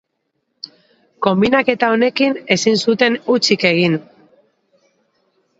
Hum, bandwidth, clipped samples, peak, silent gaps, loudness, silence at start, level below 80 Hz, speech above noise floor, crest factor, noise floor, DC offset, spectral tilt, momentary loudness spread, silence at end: none; 8 kHz; under 0.1%; 0 dBFS; none; -15 LUFS; 1.2 s; -58 dBFS; 56 dB; 18 dB; -71 dBFS; under 0.1%; -4.5 dB/octave; 17 LU; 1.6 s